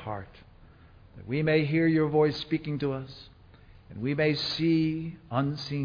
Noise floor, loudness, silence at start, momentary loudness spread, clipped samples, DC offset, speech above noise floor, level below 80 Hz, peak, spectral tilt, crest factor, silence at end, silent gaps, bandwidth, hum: -54 dBFS; -28 LUFS; 0 s; 16 LU; under 0.1%; under 0.1%; 26 dB; -56 dBFS; -12 dBFS; -7.5 dB/octave; 16 dB; 0 s; none; 5.2 kHz; none